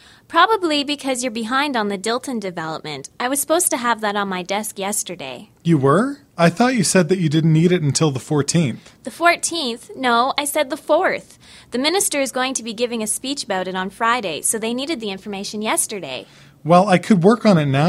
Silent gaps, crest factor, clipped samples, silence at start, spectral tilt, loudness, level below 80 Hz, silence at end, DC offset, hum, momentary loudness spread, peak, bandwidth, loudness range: none; 18 dB; under 0.1%; 0.3 s; -4.5 dB/octave; -19 LUFS; -58 dBFS; 0 s; under 0.1%; none; 12 LU; 0 dBFS; 16 kHz; 4 LU